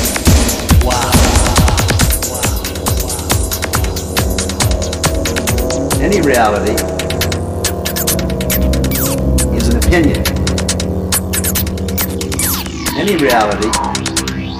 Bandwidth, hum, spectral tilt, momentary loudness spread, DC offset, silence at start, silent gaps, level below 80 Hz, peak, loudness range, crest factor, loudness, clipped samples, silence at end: 15.5 kHz; none; -4 dB/octave; 6 LU; under 0.1%; 0 s; none; -20 dBFS; 0 dBFS; 2 LU; 14 dB; -14 LUFS; under 0.1%; 0 s